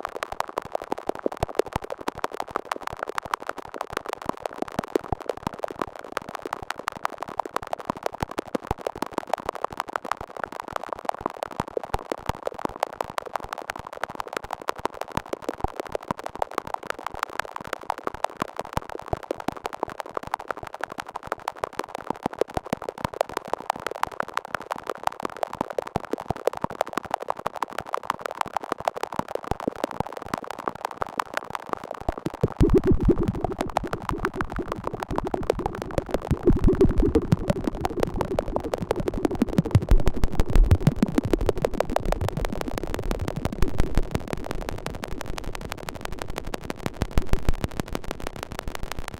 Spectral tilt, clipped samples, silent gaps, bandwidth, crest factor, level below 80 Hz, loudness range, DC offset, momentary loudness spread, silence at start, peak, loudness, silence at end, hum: -6.5 dB/octave; under 0.1%; none; 16.5 kHz; 22 dB; -32 dBFS; 7 LU; under 0.1%; 10 LU; 0 s; -4 dBFS; -29 LUFS; 0 s; none